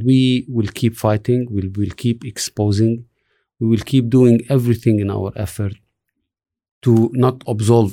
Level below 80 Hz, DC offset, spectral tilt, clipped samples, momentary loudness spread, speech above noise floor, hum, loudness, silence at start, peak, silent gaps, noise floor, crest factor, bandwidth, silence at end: -48 dBFS; under 0.1%; -7 dB/octave; under 0.1%; 10 LU; 59 dB; none; -17 LUFS; 0 s; -2 dBFS; 6.71-6.81 s; -75 dBFS; 14 dB; 16 kHz; 0 s